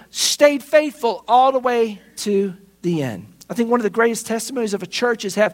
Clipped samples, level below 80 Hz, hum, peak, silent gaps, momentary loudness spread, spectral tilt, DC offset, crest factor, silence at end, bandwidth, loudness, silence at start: under 0.1%; -64 dBFS; none; 0 dBFS; none; 12 LU; -3.5 dB/octave; under 0.1%; 18 dB; 0 s; 16.5 kHz; -19 LUFS; 0.15 s